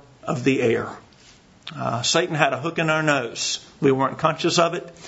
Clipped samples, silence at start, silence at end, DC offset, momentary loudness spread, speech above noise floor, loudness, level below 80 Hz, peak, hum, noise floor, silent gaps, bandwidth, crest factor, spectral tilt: under 0.1%; 0.25 s; 0 s; under 0.1%; 9 LU; 29 dB; -22 LUFS; -60 dBFS; 0 dBFS; none; -51 dBFS; none; 8 kHz; 22 dB; -4 dB/octave